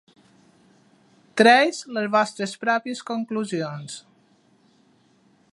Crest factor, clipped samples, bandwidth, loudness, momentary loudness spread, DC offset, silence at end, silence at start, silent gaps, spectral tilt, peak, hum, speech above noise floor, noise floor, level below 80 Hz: 22 dB; under 0.1%; 11.5 kHz; -22 LUFS; 17 LU; under 0.1%; 1.55 s; 1.35 s; none; -4 dB/octave; -2 dBFS; none; 38 dB; -60 dBFS; -80 dBFS